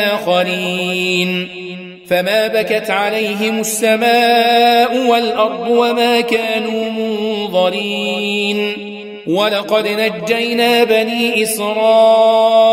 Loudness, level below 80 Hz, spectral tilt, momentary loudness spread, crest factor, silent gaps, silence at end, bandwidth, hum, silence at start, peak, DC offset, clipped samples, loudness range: -14 LUFS; -62 dBFS; -3.5 dB/octave; 8 LU; 14 dB; none; 0 s; 16 kHz; none; 0 s; 0 dBFS; under 0.1%; under 0.1%; 4 LU